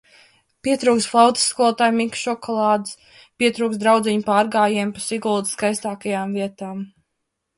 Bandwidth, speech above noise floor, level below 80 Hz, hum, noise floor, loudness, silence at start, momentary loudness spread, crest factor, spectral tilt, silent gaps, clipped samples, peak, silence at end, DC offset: 11.5 kHz; 57 dB; -64 dBFS; none; -77 dBFS; -19 LUFS; 0.65 s; 12 LU; 18 dB; -3.5 dB/octave; none; under 0.1%; -2 dBFS; 0.7 s; under 0.1%